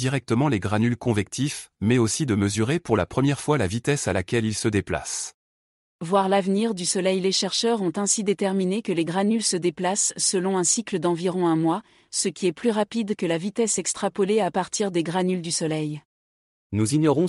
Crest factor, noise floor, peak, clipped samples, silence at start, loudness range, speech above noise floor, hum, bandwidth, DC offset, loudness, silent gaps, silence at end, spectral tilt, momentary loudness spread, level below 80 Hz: 16 dB; under -90 dBFS; -8 dBFS; under 0.1%; 0 s; 2 LU; over 67 dB; none; 12 kHz; under 0.1%; -23 LUFS; 5.34-5.99 s, 16.05-16.70 s; 0 s; -4.5 dB/octave; 6 LU; -56 dBFS